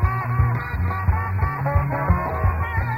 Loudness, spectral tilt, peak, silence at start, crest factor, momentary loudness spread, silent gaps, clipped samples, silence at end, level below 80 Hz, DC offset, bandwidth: -22 LUFS; -9.5 dB/octave; -4 dBFS; 0 s; 16 dB; 2 LU; none; under 0.1%; 0 s; -28 dBFS; under 0.1%; 15.5 kHz